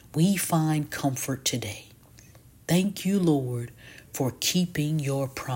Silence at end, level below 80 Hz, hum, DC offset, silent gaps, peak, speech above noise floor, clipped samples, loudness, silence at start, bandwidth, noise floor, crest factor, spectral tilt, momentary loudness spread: 0 s; -58 dBFS; none; under 0.1%; none; -10 dBFS; 26 dB; under 0.1%; -26 LUFS; 0.15 s; 17 kHz; -52 dBFS; 16 dB; -5 dB/octave; 14 LU